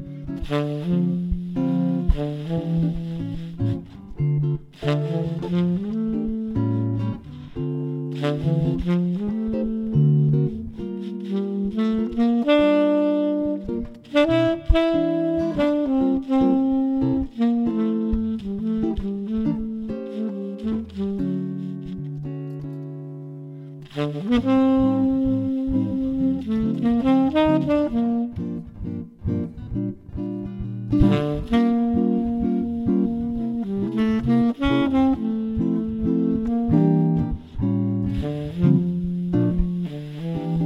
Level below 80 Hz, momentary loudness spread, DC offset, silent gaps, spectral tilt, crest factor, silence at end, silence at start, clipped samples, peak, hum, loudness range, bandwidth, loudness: -36 dBFS; 12 LU; under 0.1%; none; -9.5 dB/octave; 18 dB; 0 s; 0 s; under 0.1%; -4 dBFS; none; 6 LU; 8 kHz; -23 LUFS